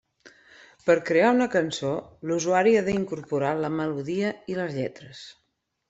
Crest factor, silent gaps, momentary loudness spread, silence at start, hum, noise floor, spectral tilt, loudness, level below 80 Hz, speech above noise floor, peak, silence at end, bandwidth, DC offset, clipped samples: 18 dB; none; 13 LU; 0.25 s; none; -54 dBFS; -5.5 dB/octave; -25 LUFS; -64 dBFS; 30 dB; -8 dBFS; 0.6 s; 8 kHz; under 0.1%; under 0.1%